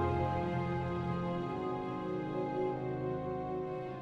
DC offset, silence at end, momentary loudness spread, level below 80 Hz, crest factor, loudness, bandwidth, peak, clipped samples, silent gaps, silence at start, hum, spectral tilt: under 0.1%; 0 s; 4 LU; -60 dBFS; 14 dB; -37 LUFS; 7.6 kHz; -22 dBFS; under 0.1%; none; 0 s; none; -9 dB/octave